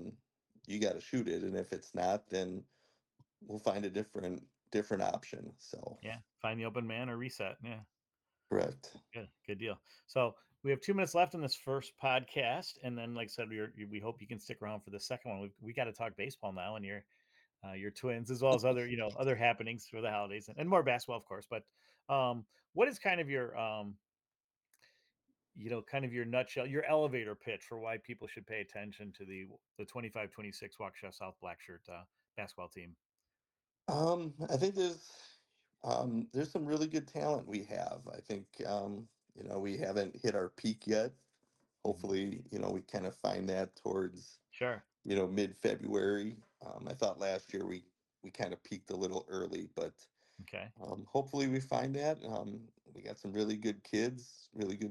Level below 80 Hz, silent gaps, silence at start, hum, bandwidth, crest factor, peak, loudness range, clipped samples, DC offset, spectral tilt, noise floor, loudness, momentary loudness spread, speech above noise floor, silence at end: -78 dBFS; 22.69-22.73 s, 24.44-24.49 s, 24.56-24.61 s, 29.71-29.75 s, 33.06-33.10 s; 0 s; none; 16.5 kHz; 22 dB; -16 dBFS; 8 LU; under 0.1%; under 0.1%; -5.5 dB/octave; under -90 dBFS; -38 LUFS; 16 LU; over 52 dB; 0 s